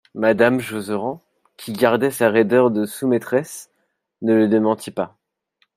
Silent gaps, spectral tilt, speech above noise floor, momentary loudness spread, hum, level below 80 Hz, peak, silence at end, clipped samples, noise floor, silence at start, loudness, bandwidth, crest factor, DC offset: none; -6 dB/octave; 48 dB; 15 LU; none; -66 dBFS; -2 dBFS; 0.7 s; under 0.1%; -67 dBFS; 0.15 s; -19 LUFS; 16 kHz; 18 dB; under 0.1%